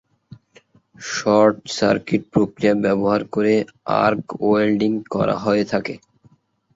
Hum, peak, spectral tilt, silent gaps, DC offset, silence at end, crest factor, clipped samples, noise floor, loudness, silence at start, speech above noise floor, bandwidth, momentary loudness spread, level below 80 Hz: none; -2 dBFS; -6 dB/octave; none; under 0.1%; 0.8 s; 18 dB; under 0.1%; -56 dBFS; -19 LUFS; 1 s; 38 dB; 8 kHz; 7 LU; -54 dBFS